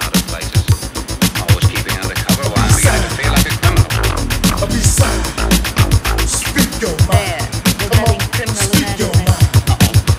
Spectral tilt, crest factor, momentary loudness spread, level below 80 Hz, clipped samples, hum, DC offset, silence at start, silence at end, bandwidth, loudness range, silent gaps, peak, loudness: -4 dB/octave; 14 dB; 5 LU; -22 dBFS; under 0.1%; none; under 0.1%; 0 s; 0 s; 16 kHz; 1 LU; none; 0 dBFS; -14 LUFS